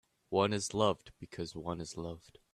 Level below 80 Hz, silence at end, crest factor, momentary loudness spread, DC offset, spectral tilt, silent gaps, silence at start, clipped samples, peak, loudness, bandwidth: -64 dBFS; 0.35 s; 22 dB; 14 LU; under 0.1%; -4.5 dB/octave; none; 0.3 s; under 0.1%; -14 dBFS; -36 LUFS; 13 kHz